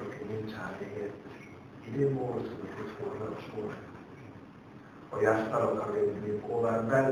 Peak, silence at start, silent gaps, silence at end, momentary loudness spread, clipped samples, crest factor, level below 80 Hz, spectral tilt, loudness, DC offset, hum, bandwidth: -12 dBFS; 0 s; none; 0 s; 21 LU; under 0.1%; 20 dB; -66 dBFS; -7.5 dB/octave; -33 LUFS; under 0.1%; none; 10.5 kHz